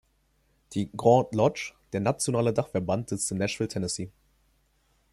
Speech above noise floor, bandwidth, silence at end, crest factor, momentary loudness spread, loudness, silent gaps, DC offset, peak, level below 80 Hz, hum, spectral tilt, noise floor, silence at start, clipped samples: 42 dB; 14.5 kHz; 1.05 s; 22 dB; 12 LU; -27 LUFS; none; under 0.1%; -6 dBFS; -60 dBFS; none; -5.5 dB/octave; -68 dBFS; 0.7 s; under 0.1%